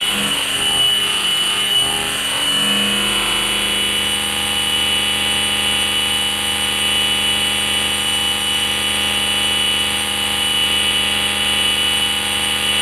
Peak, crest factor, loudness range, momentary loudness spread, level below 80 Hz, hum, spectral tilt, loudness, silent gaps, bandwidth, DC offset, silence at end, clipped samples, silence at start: -4 dBFS; 12 dB; 1 LU; 2 LU; -40 dBFS; none; -0.5 dB/octave; -15 LUFS; none; 16 kHz; under 0.1%; 0 s; under 0.1%; 0 s